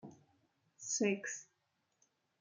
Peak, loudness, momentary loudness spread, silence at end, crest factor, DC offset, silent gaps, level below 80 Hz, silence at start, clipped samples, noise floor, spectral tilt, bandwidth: -22 dBFS; -38 LUFS; 16 LU; 1 s; 22 dB; under 0.1%; none; under -90 dBFS; 0.05 s; under 0.1%; -82 dBFS; -3 dB/octave; 10 kHz